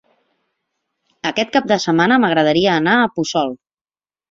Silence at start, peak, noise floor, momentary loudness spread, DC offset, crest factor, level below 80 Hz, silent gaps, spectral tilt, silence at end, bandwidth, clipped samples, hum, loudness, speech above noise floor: 1.25 s; -2 dBFS; under -90 dBFS; 10 LU; under 0.1%; 16 dB; -58 dBFS; none; -5 dB/octave; 0.75 s; 7.8 kHz; under 0.1%; none; -16 LUFS; over 75 dB